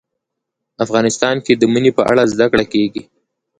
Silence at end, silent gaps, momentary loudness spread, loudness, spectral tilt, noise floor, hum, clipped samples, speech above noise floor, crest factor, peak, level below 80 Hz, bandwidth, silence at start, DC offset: 0.55 s; none; 7 LU; -14 LUFS; -5 dB/octave; -78 dBFS; none; under 0.1%; 64 dB; 16 dB; 0 dBFS; -50 dBFS; 10.5 kHz; 0.8 s; under 0.1%